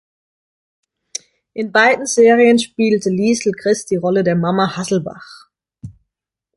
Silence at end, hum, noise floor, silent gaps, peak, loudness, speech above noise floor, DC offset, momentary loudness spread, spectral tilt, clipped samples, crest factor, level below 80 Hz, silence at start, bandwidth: 0.65 s; none; -80 dBFS; none; -2 dBFS; -15 LUFS; 65 dB; under 0.1%; 18 LU; -4.5 dB/octave; under 0.1%; 16 dB; -56 dBFS; 1.55 s; 11.5 kHz